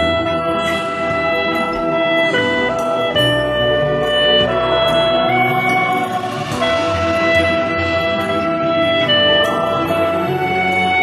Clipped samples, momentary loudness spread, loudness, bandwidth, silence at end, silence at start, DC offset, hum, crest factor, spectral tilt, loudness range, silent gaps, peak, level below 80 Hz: under 0.1%; 5 LU; -15 LUFS; 13.5 kHz; 0 s; 0 s; under 0.1%; none; 14 dB; -5 dB/octave; 2 LU; none; -2 dBFS; -40 dBFS